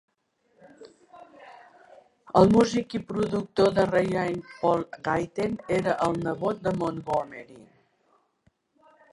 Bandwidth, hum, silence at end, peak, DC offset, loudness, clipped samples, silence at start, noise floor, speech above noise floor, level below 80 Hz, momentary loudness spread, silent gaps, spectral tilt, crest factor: 11.5 kHz; none; 1.55 s; -6 dBFS; under 0.1%; -25 LUFS; under 0.1%; 0.8 s; -69 dBFS; 44 dB; -56 dBFS; 10 LU; none; -6.5 dB/octave; 22 dB